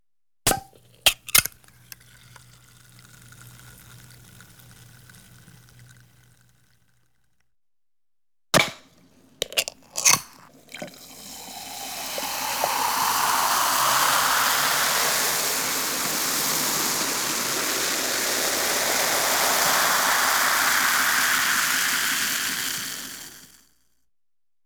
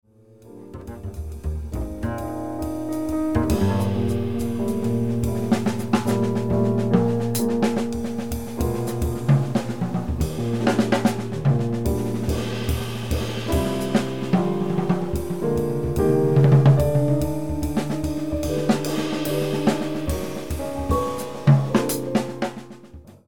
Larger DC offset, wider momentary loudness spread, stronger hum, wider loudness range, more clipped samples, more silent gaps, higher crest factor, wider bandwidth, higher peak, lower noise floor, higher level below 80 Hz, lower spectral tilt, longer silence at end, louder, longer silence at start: second, under 0.1% vs 1%; first, 14 LU vs 10 LU; neither; first, 8 LU vs 4 LU; neither; neither; first, 24 dB vs 18 dB; about the same, over 20 kHz vs 19 kHz; about the same, -2 dBFS vs -4 dBFS; first, under -90 dBFS vs -48 dBFS; second, -56 dBFS vs -36 dBFS; second, 0 dB/octave vs -7 dB/octave; first, 1.2 s vs 0 s; about the same, -21 LUFS vs -23 LUFS; first, 0.45 s vs 0 s